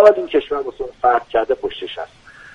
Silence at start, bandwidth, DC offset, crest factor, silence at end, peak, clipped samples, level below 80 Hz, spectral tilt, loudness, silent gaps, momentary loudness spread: 0 s; 7.6 kHz; under 0.1%; 18 dB; 0.5 s; 0 dBFS; under 0.1%; -50 dBFS; -5 dB/octave; -19 LUFS; none; 13 LU